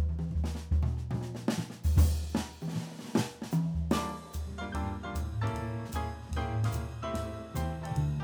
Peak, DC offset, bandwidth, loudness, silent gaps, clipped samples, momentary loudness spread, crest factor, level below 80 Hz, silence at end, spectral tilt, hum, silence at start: -12 dBFS; under 0.1%; over 20 kHz; -34 LUFS; none; under 0.1%; 8 LU; 20 dB; -36 dBFS; 0 s; -6.5 dB/octave; none; 0 s